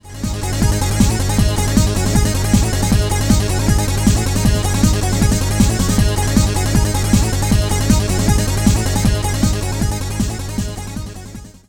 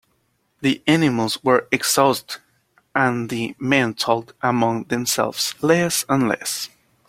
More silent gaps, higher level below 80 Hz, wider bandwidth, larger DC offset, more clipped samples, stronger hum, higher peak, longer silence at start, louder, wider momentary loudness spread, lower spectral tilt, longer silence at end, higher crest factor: neither; first, -20 dBFS vs -60 dBFS; first, 19.5 kHz vs 16.5 kHz; neither; neither; neither; about the same, 0 dBFS vs -2 dBFS; second, 0.05 s vs 0.6 s; first, -16 LUFS vs -20 LUFS; about the same, 7 LU vs 9 LU; about the same, -5 dB/octave vs -4 dB/octave; second, 0.1 s vs 0.4 s; second, 14 dB vs 20 dB